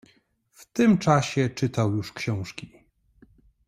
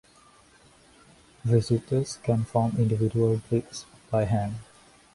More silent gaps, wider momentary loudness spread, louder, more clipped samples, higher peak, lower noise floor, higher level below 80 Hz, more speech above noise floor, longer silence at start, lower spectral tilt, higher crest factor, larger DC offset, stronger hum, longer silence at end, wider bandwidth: neither; first, 13 LU vs 10 LU; about the same, -24 LUFS vs -26 LUFS; neither; about the same, -6 dBFS vs -8 dBFS; first, -63 dBFS vs -57 dBFS; second, -58 dBFS vs -52 dBFS; first, 40 dB vs 32 dB; second, 0.6 s vs 1.45 s; about the same, -6.5 dB/octave vs -7.5 dB/octave; about the same, 20 dB vs 18 dB; neither; neither; first, 1 s vs 0.5 s; first, 15 kHz vs 11.5 kHz